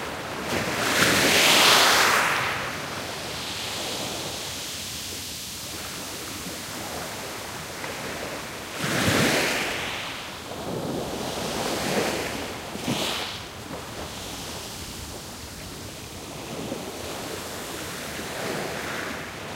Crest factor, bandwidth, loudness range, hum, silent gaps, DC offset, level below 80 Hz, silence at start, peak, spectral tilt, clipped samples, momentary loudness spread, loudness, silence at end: 24 dB; 16 kHz; 15 LU; none; none; under 0.1%; -52 dBFS; 0 s; -4 dBFS; -2 dB/octave; under 0.1%; 16 LU; -25 LUFS; 0 s